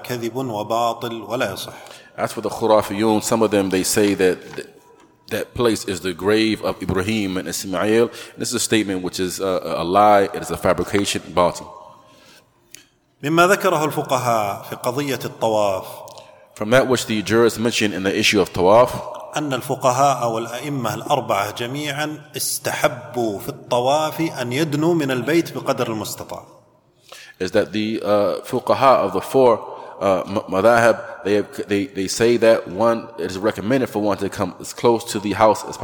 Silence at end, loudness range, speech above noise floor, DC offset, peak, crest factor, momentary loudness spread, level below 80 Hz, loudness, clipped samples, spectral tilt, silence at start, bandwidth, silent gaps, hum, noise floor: 0 s; 5 LU; 36 dB; under 0.1%; 0 dBFS; 18 dB; 11 LU; -52 dBFS; -19 LUFS; under 0.1%; -4.5 dB/octave; 0 s; 19 kHz; none; none; -55 dBFS